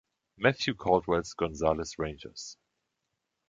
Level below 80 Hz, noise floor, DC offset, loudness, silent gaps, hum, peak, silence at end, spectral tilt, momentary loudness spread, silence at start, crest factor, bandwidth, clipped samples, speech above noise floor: -52 dBFS; -83 dBFS; under 0.1%; -30 LUFS; none; none; -8 dBFS; 0.95 s; -5 dB/octave; 15 LU; 0.4 s; 24 dB; 9.2 kHz; under 0.1%; 53 dB